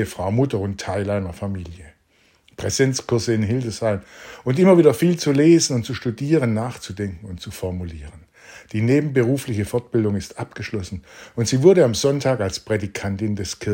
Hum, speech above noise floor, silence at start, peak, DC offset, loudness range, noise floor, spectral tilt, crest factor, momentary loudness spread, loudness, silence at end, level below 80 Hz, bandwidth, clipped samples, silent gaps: none; 40 dB; 0 s; 0 dBFS; under 0.1%; 6 LU; -59 dBFS; -6 dB/octave; 20 dB; 16 LU; -20 LUFS; 0 s; -50 dBFS; 16.5 kHz; under 0.1%; none